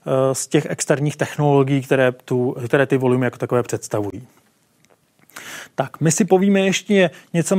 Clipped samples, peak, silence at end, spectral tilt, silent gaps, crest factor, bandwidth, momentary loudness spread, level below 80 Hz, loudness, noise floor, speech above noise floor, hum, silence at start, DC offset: under 0.1%; -2 dBFS; 0 s; -5.5 dB/octave; none; 18 dB; 16 kHz; 11 LU; -62 dBFS; -19 LUFS; -59 dBFS; 41 dB; none; 0.05 s; under 0.1%